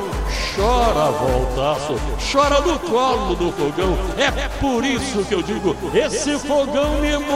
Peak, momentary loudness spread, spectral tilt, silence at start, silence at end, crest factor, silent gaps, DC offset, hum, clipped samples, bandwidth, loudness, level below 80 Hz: -2 dBFS; 5 LU; -4.5 dB/octave; 0 s; 0 s; 16 dB; none; 0.4%; none; under 0.1%; 16 kHz; -19 LUFS; -28 dBFS